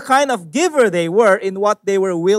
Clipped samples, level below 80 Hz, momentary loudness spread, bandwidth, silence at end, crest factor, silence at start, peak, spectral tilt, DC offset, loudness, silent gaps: under 0.1%; -74 dBFS; 5 LU; 14 kHz; 0 s; 14 dB; 0 s; -2 dBFS; -4.5 dB/octave; under 0.1%; -16 LUFS; none